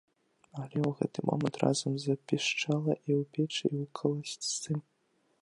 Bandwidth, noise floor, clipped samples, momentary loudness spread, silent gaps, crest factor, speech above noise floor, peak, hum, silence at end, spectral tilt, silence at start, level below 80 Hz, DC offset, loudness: 11.5 kHz; -73 dBFS; under 0.1%; 6 LU; none; 22 dB; 41 dB; -12 dBFS; none; 0.6 s; -5 dB/octave; 0.55 s; -74 dBFS; under 0.1%; -32 LUFS